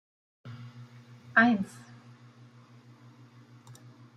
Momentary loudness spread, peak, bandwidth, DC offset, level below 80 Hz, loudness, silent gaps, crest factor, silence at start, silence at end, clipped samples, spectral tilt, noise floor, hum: 29 LU; -10 dBFS; 11 kHz; under 0.1%; -76 dBFS; -26 LUFS; none; 24 dB; 0.45 s; 2.5 s; under 0.1%; -6 dB/octave; -55 dBFS; none